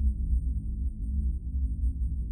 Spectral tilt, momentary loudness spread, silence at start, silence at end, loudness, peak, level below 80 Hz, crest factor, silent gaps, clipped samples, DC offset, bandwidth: -12.5 dB/octave; 3 LU; 0 s; 0 s; -32 LUFS; -16 dBFS; -28 dBFS; 12 dB; none; under 0.1%; under 0.1%; 0.5 kHz